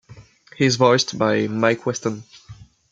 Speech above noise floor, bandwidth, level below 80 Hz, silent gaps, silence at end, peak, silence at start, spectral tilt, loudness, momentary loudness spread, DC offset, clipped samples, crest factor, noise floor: 27 dB; 9.2 kHz; -58 dBFS; none; 0.3 s; -2 dBFS; 0.1 s; -4.5 dB/octave; -19 LUFS; 11 LU; under 0.1%; under 0.1%; 20 dB; -46 dBFS